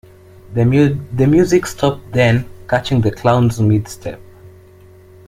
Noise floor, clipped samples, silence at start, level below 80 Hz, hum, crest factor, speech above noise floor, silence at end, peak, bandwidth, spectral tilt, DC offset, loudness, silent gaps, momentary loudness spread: -43 dBFS; under 0.1%; 0.5 s; -40 dBFS; none; 14 dB; 28 dB; 0.8 s; -2 dBFS; 15.5 kHz; -7 dB/octave; under 0.1%; -15 LUFS; none; 12 LU